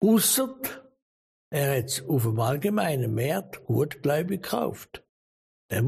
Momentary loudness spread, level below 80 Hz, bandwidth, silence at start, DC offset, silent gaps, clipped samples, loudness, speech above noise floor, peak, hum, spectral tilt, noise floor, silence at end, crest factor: 12 LU; -62 dBFS; 15.5 kHz; 0 s; under 0.1%; 1.02-1.51 s, 5.09-5.69 s; under 0.1%; -26 LUFS; over 64 dB; -12 dBFS; none; -5 dB/octave; under -90 dBFS; 0 s; 16 dB